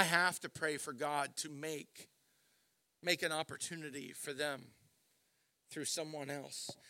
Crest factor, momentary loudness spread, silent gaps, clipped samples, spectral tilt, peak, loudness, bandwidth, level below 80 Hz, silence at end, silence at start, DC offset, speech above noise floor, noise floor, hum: 30 dB; 12 LU; none; under 0.1%; -2.5 dB/octave; -12 dBFS; -39 LUFS; 16.5 kHz; -86 dBFS; 0 s; 0 s; under 0.1%; 39 dB; -79 dBFS; none